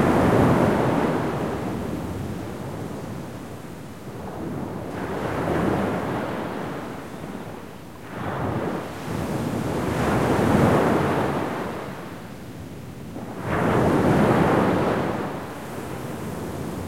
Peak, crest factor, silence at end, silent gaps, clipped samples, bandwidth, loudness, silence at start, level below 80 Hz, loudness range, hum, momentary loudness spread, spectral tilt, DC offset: -6 dBFS; 18 dB; 0 s; none; under 0.1%; 16.5 kHz; -24 LUFS; 0 s; -46 dBFS; 8 LU; none; 18 LU; -7 dB/octave; 0.5%